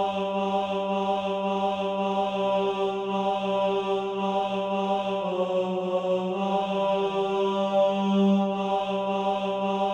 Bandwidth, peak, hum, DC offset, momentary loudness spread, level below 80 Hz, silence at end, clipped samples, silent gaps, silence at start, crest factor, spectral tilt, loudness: 8.6 kHz; -12 dBFS; none; under 0.1%; 4 LU; -64 dBFS; 0 s; under 0.1%; none; 0 s; 12 dB; -7 dB/octave; -26 LUFS